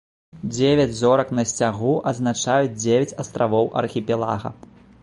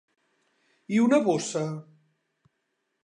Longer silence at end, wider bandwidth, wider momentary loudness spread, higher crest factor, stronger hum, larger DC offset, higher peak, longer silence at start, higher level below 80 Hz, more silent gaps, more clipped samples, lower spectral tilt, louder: second, 0.5 s vs 1.2 s; about the same, 11.5 kHz vs 10.5 kHz; second, 9 LU vs 12 LU; about the same, 18 dB vs 20 dB; neither; neither; first, -4 dBFS vs -10 dBFS; second, 0.35 s vs 0.9 s; first, -52 dBFS vs -80 dBFS; neither; neither; about the same, -5 dB/octave vs -5.5 dB/octave; first, -21 LUFS vs -25 LUFS